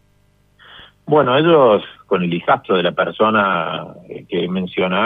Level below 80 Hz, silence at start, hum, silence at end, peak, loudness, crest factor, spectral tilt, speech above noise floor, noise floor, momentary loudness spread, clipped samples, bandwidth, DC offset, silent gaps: -58 dBFS; 0.75 s; 50 Hz at -50 dBFS; 0 s; -2 dBFS; -16 LUFS; 14 dB; -9 dB/octave; 40 dB; -56 dBFS; 13 LU; under 0.1%; 4.6 kHz; under 0.1%; none